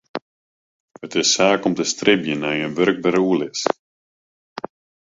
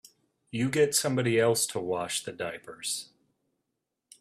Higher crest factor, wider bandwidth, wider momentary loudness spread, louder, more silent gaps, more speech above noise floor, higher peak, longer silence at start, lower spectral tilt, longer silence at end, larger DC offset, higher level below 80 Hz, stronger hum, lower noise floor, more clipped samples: about the same, 20 dB vs 20 dB; second, 8 kHz vs 15.5 kHz; first, 18 LU vs 12 LU; first, -19 LUFS vs -28 LUFS; first, 0.22-0.88 s, 3.79-4.56 s vs none; first, over 71 dB vs 56 dB; first, -2 dBFS vs -12 dBFS; second, 0.15 s vs 0.55 s; about the same, -3.5 dB/octave vs -3.5 dB/octave; second, 0.4 s vs 1.15 s; neither; first, -62 dBFS vs -70 dBFS; neither; first, under -90 dBFS vs -84 dBFS; neither